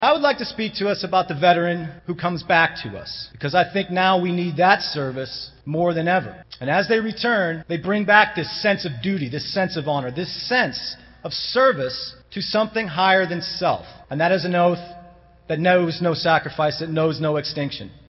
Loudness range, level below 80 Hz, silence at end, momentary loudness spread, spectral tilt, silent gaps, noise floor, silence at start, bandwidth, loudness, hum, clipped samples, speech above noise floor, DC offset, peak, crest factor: 2 LU; -54 dBFS; 0.1 s; 12 LU; -3 dB/octave; none; -47 dBFS; 0 s; 6 kHz; -21 LUFS; none; under 0.1%; 26 dB; under 0.1%; 0 dBFS; 22 dB